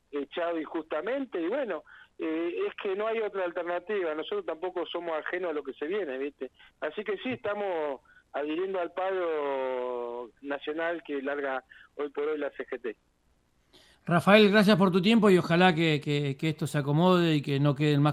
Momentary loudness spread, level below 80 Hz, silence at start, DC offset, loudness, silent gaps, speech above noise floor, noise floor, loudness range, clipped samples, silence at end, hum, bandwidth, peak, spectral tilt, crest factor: 15 LU; -68 dBFS; 0.15 s; under 0.1%; -28 LUFS; none; 41 dB; -69 dBFS; 11 LU; under 0.1%; 0 s; none; 14.5 kHz; -4 dBFS; -6.5 dB/octave; 24 dB